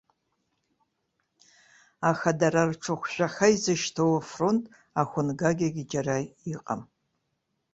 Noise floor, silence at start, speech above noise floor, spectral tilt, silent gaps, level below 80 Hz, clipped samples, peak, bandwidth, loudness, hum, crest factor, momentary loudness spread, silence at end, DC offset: -78 dBFS; 2 s; 52 dB; -5 dB/octave; none; -64 dBFS; under 0.1%; -6 dBFS; 8.2 kHz; -27 LUFS; none; 22 dB; 10 LU; 0.9 s; under 0.1%